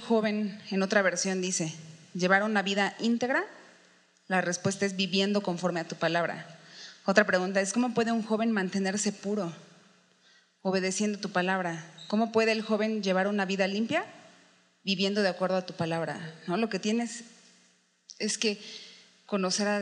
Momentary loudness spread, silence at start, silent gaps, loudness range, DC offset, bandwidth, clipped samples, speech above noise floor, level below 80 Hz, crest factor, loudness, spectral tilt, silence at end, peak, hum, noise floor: 13 LU; 0 s; none; 4 LU; under 0.1%; 10.5 kHz; under 0.1%; 37 dB; -88 dBFS; 24 dB; -29 LUFS; -4 dB/octave; 0 s; -6 dBFS; none; -66 dBFS